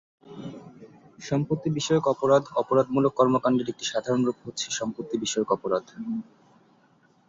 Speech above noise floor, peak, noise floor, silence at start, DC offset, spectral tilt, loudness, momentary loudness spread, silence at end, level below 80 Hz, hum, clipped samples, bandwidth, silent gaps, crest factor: 36 dB; -6 dBFS; -61 dBFS; 0.25 s; under 0.1%; -5 dB/octave; -26 LUFS; 15 LU; 1.05 s; -64 dBFS; none; under 0.1%; 8 kHz; none; 20 dB